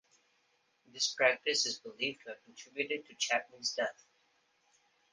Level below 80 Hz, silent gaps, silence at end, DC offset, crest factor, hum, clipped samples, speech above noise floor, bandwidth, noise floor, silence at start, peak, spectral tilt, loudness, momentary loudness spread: -86 dBFS; none; 1.2 s; under 0.1%; 24 dB; none; under 0.1%; 39 dB; 10 kHz; -75 dBFS; 0.95 s; -14 dBFS; 0 dB/octave; -33 LUFS; 19 LU